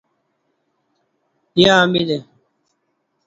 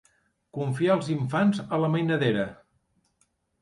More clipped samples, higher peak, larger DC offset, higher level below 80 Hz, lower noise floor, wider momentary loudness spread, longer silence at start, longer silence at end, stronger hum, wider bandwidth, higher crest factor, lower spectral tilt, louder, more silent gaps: neither; first, 0 dBFS vs -10 dBFS; neither; first, -56 dBFS vs -64 dBFS; about the same, -70 dBFS vs -71 dBFS; about the same, 11 LU vs 9 LU; first, 1.55 s vs 0.55 s; about the same, 1.05 s vs 1.1 s; neither; second, 7.8 kHz vs 11.5 kHz; about the same, 20 dB vs 18 dB; second, -5 dB/octave vs -7.5 dB/octave; first, -15 LUFS vs -26 LUFS; neither